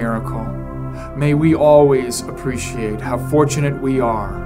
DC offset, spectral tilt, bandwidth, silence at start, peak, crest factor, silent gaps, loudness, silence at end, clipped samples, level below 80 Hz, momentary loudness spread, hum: under 0.1%; -6.5 dB/octave; 16 kHz; 0 s; 0 dBFS; 16 dB; none; -17 LUFS; 0 s; under 0.1%; -34 dBFS; 16 LU; none